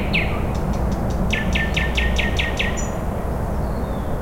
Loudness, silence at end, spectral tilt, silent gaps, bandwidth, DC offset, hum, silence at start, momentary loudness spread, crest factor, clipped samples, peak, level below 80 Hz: -22 LUFS; 0 s; -5 dB/octave; none; 16.5 kHz; under 0.1%; none; 0 s; 5 LU; 14 dB; under 0.1%; -6 dBFS; -26 dBFS